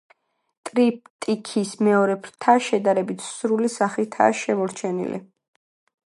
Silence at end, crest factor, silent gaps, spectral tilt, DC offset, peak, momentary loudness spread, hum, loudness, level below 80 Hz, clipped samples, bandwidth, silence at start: 0.85 s; 20 dB; 1.10-1.19 s; -5 dB/octave; under 0.1%; -2 dBFS; 9 LU; none; -22 LUFS; -74 dBFS; under 0.1%; 11.5 kHz; 0.65 s